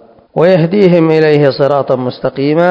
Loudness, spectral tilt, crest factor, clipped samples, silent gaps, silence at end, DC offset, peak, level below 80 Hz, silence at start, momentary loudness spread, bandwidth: -10 LUFS; -9 dB/octave; 10 dB; 0.9%; none; 0 s; under 0.1%; 0 dBFS; -52 dBFS; 0.35 s; 7 LU; 8 kHz